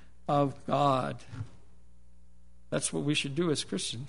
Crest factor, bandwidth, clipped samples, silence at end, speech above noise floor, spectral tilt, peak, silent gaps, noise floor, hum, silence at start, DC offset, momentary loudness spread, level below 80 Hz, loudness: 18 dB; 11 kHz; under 0.1%; 0 s; 29 dB; -4.5 dB/octave; -14 dBFS; none; -60 dBFS; none; 0.3 s; 0.5%; 15 LU; -60 dBFS; -30 LUFS